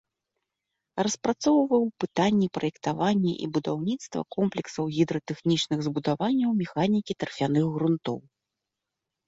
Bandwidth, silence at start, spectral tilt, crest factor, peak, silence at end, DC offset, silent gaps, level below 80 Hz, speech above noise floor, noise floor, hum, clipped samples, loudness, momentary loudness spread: 8 kHz; 0.95 s; -6 dB/octave; 16 dB; -10 dBFS; 1.05 s; under 0.1%; none; -66 dBFS; 60 dB; -86 dBFS; none; under 0.1%; -27 LUFS; 7 LU